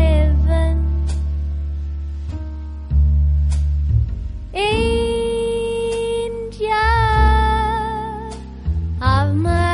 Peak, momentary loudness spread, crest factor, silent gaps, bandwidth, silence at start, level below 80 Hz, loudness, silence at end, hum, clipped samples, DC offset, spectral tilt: -2 dBFS; 12 LU; 14 dB; none; 11 kHz; 0 s; -20 dBFS; -19 LUFS; 0 s; none; under 0.1%; under 0.1%; -6.5 dB/octave